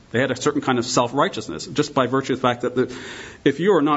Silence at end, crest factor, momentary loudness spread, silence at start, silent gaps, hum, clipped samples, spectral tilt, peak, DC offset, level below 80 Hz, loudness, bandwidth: 0 s; 18 dB; 8 LU; 0.15 s; none; none; under 0.1%; -5 dB/octave; -4 dBFS; under 0.1%; -56 dBFS; -21 LUFS; 8 kHz